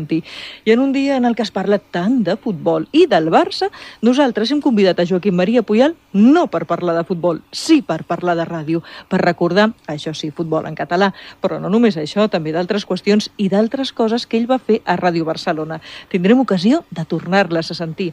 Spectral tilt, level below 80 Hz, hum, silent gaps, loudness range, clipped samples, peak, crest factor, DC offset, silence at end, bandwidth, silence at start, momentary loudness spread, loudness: -6 dB/octave; -58 dBFS; none; none; 3 LU; under 0.1%; 0 dBFS; 16 dB; under 0.1%; 0 s; 11.5 kHz; 0 s; 9 LU; -17 LUFS